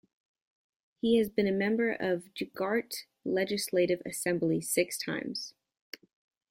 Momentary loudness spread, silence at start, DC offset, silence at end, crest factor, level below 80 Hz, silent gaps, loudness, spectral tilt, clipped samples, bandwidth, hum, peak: 13 LU; 1.05 s; under 0.1%; 1 s; 20 dB; -70 dBFS; none; -31 LUFS; -4.5 dB/octave; under 0.1%; 16.5 kHz; none; -12 dBFS